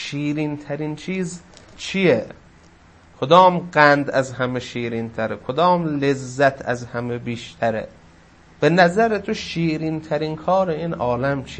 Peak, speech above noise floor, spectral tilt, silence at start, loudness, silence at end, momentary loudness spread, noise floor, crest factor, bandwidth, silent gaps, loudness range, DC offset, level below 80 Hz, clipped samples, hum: 0 dBFS; 29 dB; -6 dB/octave; 0 s; -20 LUFS; 0 s; 13 LU; -49 dBFS; 20 dB; 8.8 kHz; none; 4 LU; under 0.1%; -52 dBFS; under 0.1%; none